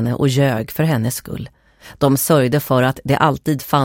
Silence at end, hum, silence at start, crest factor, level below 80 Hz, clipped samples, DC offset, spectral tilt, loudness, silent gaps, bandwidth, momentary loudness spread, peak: 0 s; none; 0 s; 16 dB; -46 dBFS; under 0.1%; under 0.1%; -6 dB/octave; -17 LUFS; none; 17 kHz; 11 LU; -2 dBFS